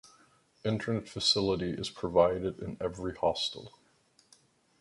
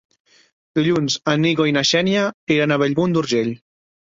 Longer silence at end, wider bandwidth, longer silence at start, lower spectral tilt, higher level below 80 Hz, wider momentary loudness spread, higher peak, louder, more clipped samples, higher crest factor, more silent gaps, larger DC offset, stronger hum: first, 1.1 s vs 0.5 s; first, 11.5 kHz vs 7.8 kHz; about the same, 0.65 s vs 0.75 s; about the same, -4.5 dB/octave vs -5 dB/octave; about the same, -56 dBFS vs -58 dBFS; first, 10 LU vs 5 LU; second, -10 dBFS vs -4 dBFS; second, -31 LUFS vs -18 LUFS; neither; first, 22 dB vs 16 dB; second, none vs 2.34-2.47 s; neither; neither